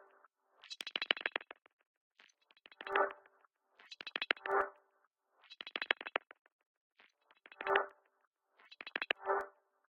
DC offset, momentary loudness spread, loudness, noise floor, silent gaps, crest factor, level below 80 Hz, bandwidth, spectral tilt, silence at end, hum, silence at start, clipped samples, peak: under 0.1%; 17 LU; -38 LUFS; -79 dBFS; 1.73-1.77 s, 1.87-2.10 s, 5.07-5.11 s, 6.41-6.45 s, 6.52-6.59 s, 6.66-6.90 s, 8.27-8.31 s; 32 dB; -82 dBFS; 9 kHz; -2 dB/octave; 0.4 s; none; 0.65 s; under 0.1%; -10 dBFS